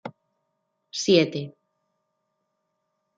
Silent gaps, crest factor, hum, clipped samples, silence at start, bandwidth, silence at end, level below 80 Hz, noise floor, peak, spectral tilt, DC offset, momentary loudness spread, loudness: none; 22 dB; none; under 0.1%; 0.05 s; 9.2 kHz; 1.7 s; -72 dBFS; -77 dBFS; -6 dBFS; -4.5 dB/octave; under 0.1%; 21 LU; -22 LUFS